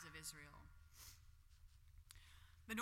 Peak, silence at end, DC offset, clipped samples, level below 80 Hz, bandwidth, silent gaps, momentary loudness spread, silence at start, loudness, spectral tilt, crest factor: -32 dBFS; 0 s; under 0.1%; under 0.1%; -68 dBFS; 16.5 kHz; none; 16 LU; 0 s; -58 LUFS; -3 dB/octave; 24 dB